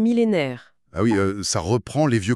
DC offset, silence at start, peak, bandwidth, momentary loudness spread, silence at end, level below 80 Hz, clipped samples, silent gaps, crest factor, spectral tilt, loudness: under 0.1%; 0 s; -8 dBFS; 12.5 kHz; 10 LU; 0 s; -50 dBFS; under 0.1%; none; 14 dB; -5.5 dB/octave; -22 LUFS